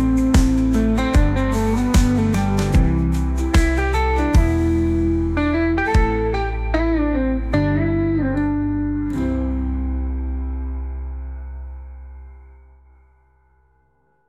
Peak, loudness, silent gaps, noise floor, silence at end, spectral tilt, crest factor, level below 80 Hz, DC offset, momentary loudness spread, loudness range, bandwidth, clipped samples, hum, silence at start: -4 dBFS; -19 LUFS; none; -62 dBFS; 1.8 s; -7 dB/octave; 14 dB; -24 dBFS; under 0.1%; 13 LU; 13 LU; 14 kHz; under 0.1%; none; 0 s